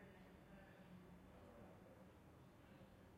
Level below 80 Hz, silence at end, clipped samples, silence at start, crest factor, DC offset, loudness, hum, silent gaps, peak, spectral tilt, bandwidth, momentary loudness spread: -74 dBFS; 0 s; under 0.1%; 0 s; 14 dB; under 0.1%; -65 LUFS; none; none; -50 dBFS; -6.5 dB/octave; 15.5 kHz; 3 LU